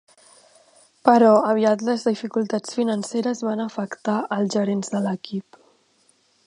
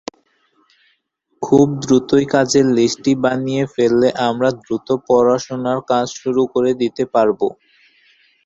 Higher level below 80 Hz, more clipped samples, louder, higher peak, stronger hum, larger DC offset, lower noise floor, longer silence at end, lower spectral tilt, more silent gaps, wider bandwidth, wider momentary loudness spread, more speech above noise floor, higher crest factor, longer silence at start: second, -74 dBFS vs -54 dBFS; neither; second, -22 LUFS vs -16 LUFS; about the same, 0 dBFS vs -2 dBFS; neither; neither; about the same, -62 dBFS vs -65 dBFS; about the same, 1.05 s vs 0.95 s; about the same, -5.5 dB/octave vs -5.5 dB/octave; neither; first, 11 kHz vs 7.8 kHz; first, 12 LU vs 7 LU; second, 41 dB vs 50 dB; first, 22 dB vs 16 dB; second, 1.05 s vs 1.4 s